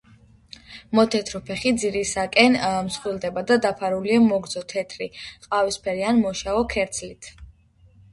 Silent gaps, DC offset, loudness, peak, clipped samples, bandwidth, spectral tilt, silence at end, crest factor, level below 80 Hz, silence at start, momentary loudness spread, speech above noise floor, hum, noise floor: none; under 0.1%; -22 LUFS; -2 dBFS; under 0.1%; 11.5 kHz; -4 dB/octave; 0.65 s; 22 dB; -50 dBFS; 0.7 s; 15 LU; 32 dB; none; -54 dBFS